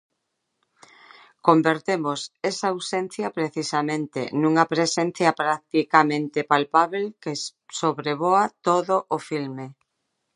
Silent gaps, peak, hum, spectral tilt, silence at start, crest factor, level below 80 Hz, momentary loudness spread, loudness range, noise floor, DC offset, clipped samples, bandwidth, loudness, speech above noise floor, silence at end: none; -2 dBFS; none; -4.5 dB/octave; 1.45 s; 22 dB; -76 dBFS; 10 LU; 4 LU; -77 dBFS; under 0.1%; under 0.1%; 11 kHz; -23 LUFS; 55 dB; 0.65 s